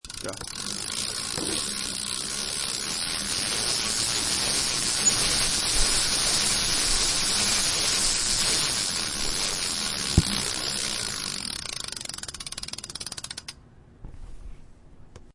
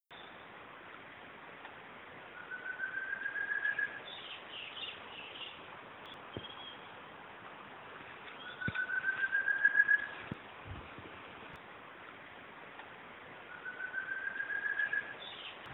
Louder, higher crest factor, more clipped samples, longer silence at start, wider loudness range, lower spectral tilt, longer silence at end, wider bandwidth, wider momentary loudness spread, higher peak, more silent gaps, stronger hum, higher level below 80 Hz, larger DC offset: first, -24 LUFS vs -36 LUFS; about the same, 24 dB vs 24 dB; neither; about the same, 0.05 s vs 0.1 s; about the same, 12 LU vs 14 LU; second, -1 dB/octave vs -5.5 dB/octave; about the same, 0.05 s vs 0 s; first, 11.5 kHz vs 4.2 kHz; second, 13 LU vs 18 LU; first, -4 dBFS vs -16 dBFS; neither; neither; first, -40 dBFS vs -70 dBFS; neither